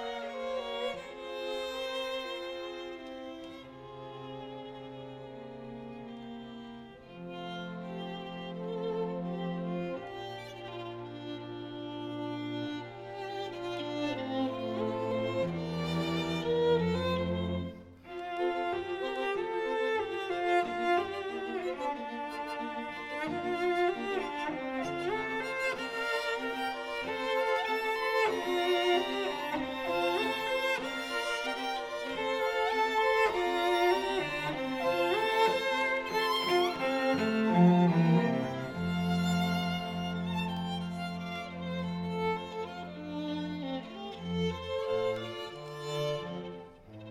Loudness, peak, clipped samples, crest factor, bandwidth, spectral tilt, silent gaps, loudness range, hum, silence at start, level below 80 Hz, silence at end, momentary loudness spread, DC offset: -32 LUFS; -14 dBFS; under 0.1%; 20 dB; 15.5 kHz; -6 dB/octave; none; 12 LU; none; 0 s; -62 dBFS; 0 s; 15 LU; under 0.1%